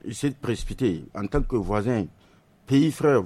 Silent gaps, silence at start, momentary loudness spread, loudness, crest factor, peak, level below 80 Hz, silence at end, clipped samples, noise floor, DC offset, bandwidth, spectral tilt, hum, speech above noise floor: none; 0.05 s; 9 LU; -25 LUFS; 14 dB; -10 dBFS; -38 dBFS; 0 s; under 0.1%; -57 dBFS; under 0.1%; 13.5 kHz; -7 dB/octave; none; 33 dB